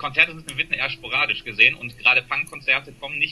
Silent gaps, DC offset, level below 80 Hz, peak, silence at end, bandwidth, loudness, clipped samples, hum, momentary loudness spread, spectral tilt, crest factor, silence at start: none; under 0.1%; -54 dBFS; 0 dBFS; 0 s; 12.5 kHz; -20 LUFS; under 0.1%; none; 8 LU; -2.5 dB/octave; 22 dB; 0 s